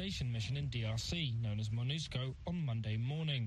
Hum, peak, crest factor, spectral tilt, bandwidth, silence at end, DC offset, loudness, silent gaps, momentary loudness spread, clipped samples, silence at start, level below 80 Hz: none; -24 dBFS; 12 dB; -5.5 dB/octave; 12 kHz; 0 s; under 0.1%; -39 LUFS; none; 3 LU; under 0.1%; 0 s; -54 dBFS